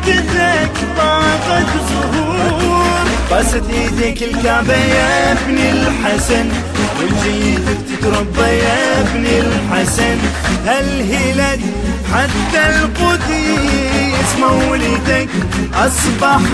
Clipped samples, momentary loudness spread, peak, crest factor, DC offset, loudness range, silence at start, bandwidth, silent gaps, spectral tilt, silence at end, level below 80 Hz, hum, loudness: under 0.1%; 4 LU; 0 dBFS; 12 dB; 0.2%; 1 LU; 0 s; 11 kHz; none; -4.5 dB/octave; 0 s; -24 dBFS; none; -13 LUFS